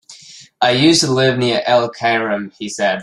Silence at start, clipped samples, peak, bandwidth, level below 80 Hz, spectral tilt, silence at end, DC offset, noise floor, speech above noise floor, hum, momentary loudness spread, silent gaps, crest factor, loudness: 0.1 s; under 0.1%; -2 dBFS; 12.5 kHz; -56 dBFS; -4 dB/octave; 0 s; under 0.1%; -41 dBFS; 25 dB; none; 9 LU; none; 16 dB; -15 LUFS